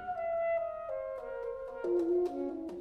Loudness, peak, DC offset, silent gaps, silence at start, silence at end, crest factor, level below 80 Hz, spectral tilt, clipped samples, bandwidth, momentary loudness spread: -35 LUFS; -22 dBFS; under 0.1%; none; 0 s; 0 s; 12 dB; -64 dBFS; -7.5 dB/octave; under 0.1%; 6.2 kHz; 9 LU